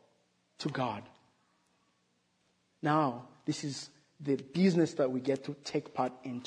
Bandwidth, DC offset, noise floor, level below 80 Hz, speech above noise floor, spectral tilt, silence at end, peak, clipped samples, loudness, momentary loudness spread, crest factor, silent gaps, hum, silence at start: 10 kHz; under 0.1%; -75 dBFS; -80 dBFS; 43 dB; -6 dB/octave; 0 s; -14 dBFS; under 0.1%; -33 LUFS; 12 LU; 20 dB; none; none; 0.6 s